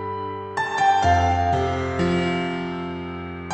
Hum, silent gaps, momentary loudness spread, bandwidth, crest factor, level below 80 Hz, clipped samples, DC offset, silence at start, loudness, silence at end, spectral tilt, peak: none; none; 12 LU; 9 kHz; 16 dB; -40 dBFS; under 0.1%; under 0.1%; 0 s; -22 LUFS; 0 s; -6 dB/octave; -6 dBFS